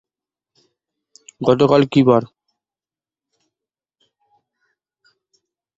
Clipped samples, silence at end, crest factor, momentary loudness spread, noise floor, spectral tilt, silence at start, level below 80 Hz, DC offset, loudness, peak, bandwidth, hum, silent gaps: under 0.1%; 3.55 s; 20 dB; 9 LU; under -90 dBFS; -7.5 dB/octave; 1.4 s; -58 dBFS; under 0.1%; -15 LUFS; -2 dBFS; 7.8 kHz; none; none